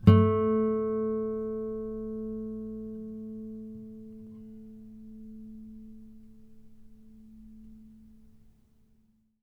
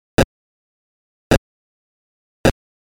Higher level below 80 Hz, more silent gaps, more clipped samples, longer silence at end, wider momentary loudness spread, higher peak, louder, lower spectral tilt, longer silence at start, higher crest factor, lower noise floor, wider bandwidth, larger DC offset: second, -54 dBFS vs -34 dBFS; second, none vs 0.24-1.30 s, 1.38-2.44 s; neither; first, 1.55 s vs 0.3 s; first, 25 LU vs 0 LU; second, -6 dBFS vs -2 dBFS; second, -30 LUFS vs -20 LUFS; first, -10.5 dB/octave vs -5.5 dB/octave; second, 0 s vs 0.2 s; first, 26 dB vs 20 dB; second, -66 dBFS vs under -90 dBFS; second, 4.9 kHz vs 19.5 kHz; neither